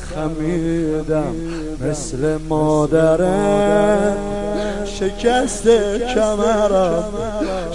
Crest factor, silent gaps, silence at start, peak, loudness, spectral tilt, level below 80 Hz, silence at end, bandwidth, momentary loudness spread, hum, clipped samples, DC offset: 16 dB; none; 0 s; -2 dBFS; -18 LUFS; -5.5 dB/octave; -32 dBFS; 0 s; 11.5 kHz; 9 LU; none; under 0.1%; 2%